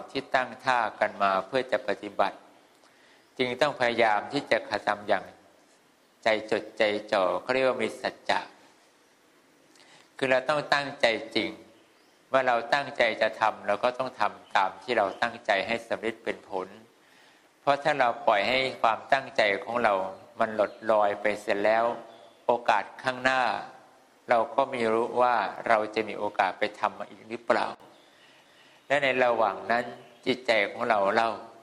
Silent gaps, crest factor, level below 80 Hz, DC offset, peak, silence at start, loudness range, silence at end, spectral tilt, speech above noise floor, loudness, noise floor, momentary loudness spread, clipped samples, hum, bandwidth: none; 22 dB; -70 dBFS; under 0.1%; -6 dBFS; 0 s; 3 LU; 0.1 s; -4 dB/octave; 35 dB; -27 LUFS; -62 dBFS; 8 LU; under 0.1%; none; 12.5 kHz